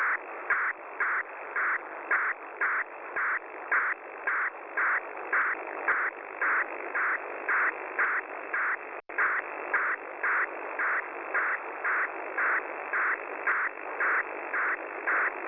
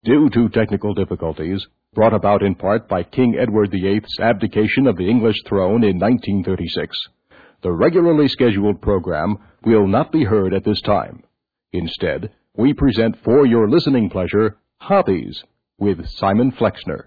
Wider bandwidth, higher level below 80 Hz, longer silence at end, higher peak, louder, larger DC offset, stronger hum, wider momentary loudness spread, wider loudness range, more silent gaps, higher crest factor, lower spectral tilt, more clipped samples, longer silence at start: first, 6 kHz vs 4.9 kHz; second, -78 dBFS vs -42 dBFS; about the same, 0 s vs 0.05 s; second, -16 dBFS vs -4 dBFS; second, -29 LUFS vs -17 LUFS; second, under 0.1% vs 0.2%; neither; second, 5 LU vs 10 LU; about the same, 1 LU vs 2 LU; neither; about the same, 14 dB vs 14 dB; second, -5.5 dB/octave vs -9.5 dB/octave; neither; about the same, 0 s vs 0.05 s